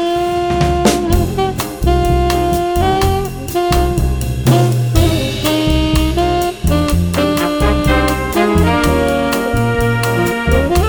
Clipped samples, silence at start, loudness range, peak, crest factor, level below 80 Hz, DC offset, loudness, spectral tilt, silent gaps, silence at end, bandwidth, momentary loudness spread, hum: under 0.1%; 0 s; 1 LU; 0 dBFS; 14 dB; -20 dBFS; under 0.1%; -14 LUFS; -6 dB/octave; none; 0 s; over 20 kHz; 4 LU; none